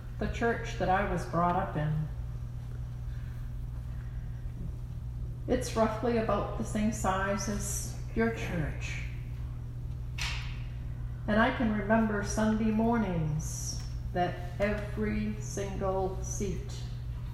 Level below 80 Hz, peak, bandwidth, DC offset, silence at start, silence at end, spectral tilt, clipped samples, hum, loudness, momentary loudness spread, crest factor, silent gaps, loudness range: -40 dBFS; -14 dBFS; 14.5 kHz; under 0.1%; 0 s; 0 s; -5.5 dB/octave; under 0.1%; none; -33 LUFS; 12 LU; 18 dB; none; 7 LU